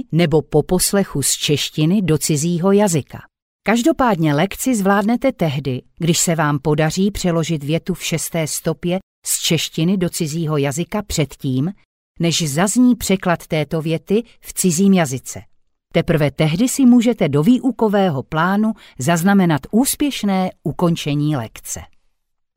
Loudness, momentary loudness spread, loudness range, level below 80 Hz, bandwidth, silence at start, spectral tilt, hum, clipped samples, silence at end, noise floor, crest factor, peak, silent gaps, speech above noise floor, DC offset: -17 LUFS; 8 LU; 4 LU; -44 dBFS; 16.5 kHz; 0.1 s; -5 dB/octave; none; under 0.1%; 0.7 s; -65 dBFS; 14 dB; -4 dBFS; 3.42-3.59 s, 9.03-9.22 s, 11.85-12.15 s; 48 dB; under 0.1%